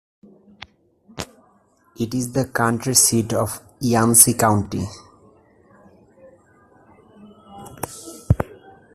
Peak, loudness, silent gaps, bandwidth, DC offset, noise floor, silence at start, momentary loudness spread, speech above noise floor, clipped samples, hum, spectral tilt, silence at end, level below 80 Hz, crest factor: 0 dBFS; -18 LUFS; none; 15.5 kHz; under 0.1%; -58 dBFS; 1.15 s; 22 LU; 40 dB; under 0.1%; none; -3.5 dB/octave; 0.4 s; -44 dBFS; 22 dB